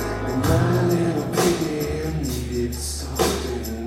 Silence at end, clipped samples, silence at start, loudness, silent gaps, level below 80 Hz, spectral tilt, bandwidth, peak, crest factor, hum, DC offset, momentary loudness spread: 0 s; under 0.1%; 0 s; -23 LUFS; none; -34 dBFS; -5.5 dB/octave; 16.5 kHz; -6 dBFS; 16 dB; none; under 0.1%; 7 LU